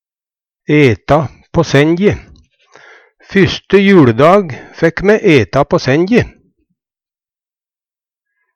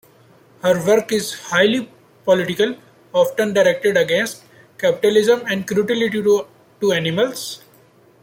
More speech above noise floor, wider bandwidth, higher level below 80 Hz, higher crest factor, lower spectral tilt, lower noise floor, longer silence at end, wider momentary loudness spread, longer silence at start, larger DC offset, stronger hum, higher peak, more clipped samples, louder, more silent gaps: first, over 80 dB vs 34 dB; second, 9.8 kHz vs 17 kHz; first, -38 dBFS vs -62 dBFS; about the same, 12 dB vs 16 dB; first, -7 dB/octave vs -4 dB/octave; first, under -90 dBFS vs -51 dBFS; first, 2.25 s vs 0.65 s; about the same, 9 LU vs 11 LU; about the same, 0.7 s vs 0.65 s; neither; neither; about the same, 0 dBFS vs -2 dBFS; neither; first, -11 LUFS vs -18 LUFS; neither